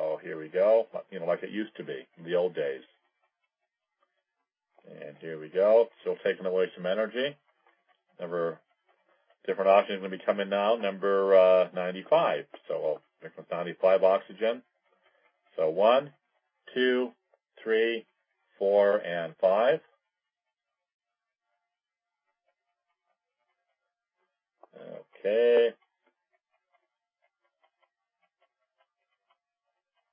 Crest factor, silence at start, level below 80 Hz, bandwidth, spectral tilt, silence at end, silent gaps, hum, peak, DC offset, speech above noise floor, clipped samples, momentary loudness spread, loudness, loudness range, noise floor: 20 dB; 0 s; under -90 dBFS; 5.2 kHz; -8.5 dB/octave; 4.4 s; 20.94-20.99 s; none; -10 dBFS; under 0.1%; 63 dB; under 0.1%; 18 LU; -27 LUFS; 9 LU; -90 dBFS